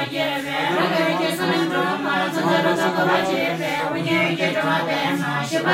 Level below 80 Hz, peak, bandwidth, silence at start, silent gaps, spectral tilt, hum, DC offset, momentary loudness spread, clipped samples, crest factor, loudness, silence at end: -66 dBFS; -6 dBFS; 16 kHz; 0 s; none; -5 dB/octave; none; under 0.1%; 4 LU; under 0.1%; 16 dB; -20 LUFS; 0 s